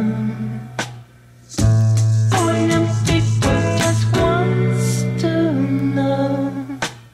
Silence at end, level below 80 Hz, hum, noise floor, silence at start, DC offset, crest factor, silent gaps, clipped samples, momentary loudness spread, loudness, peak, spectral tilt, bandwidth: 0.1 s; -36 dBFS; none; -44 dBFS; 0 s; under 0.1%; 12 dB; none; under 0.1%; 10 LU; -18 LUFS; -4 dBFS; -6 dB/octave; 13 kHz